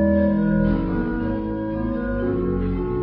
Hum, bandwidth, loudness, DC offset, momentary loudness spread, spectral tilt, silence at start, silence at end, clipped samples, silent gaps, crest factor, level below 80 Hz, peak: none; 4.9 kHz; -22 LUFS; under 0.1%; 6 LU; -12.5 dB/octave; 0 s; 0 s; under 0.1%; none; 14 dB; -32 dBFS; -8 dBFS